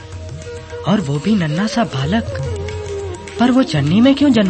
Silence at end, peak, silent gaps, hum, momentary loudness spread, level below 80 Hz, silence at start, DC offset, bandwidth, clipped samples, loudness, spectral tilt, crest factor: 0 s; -2 dBFS; none; none; 17 LU; -40 dBFS; 0 s; under 0.1%; 8.8 kHz; under 0.1%; -16 LUFS; -6.5 dB/octave; 14 dB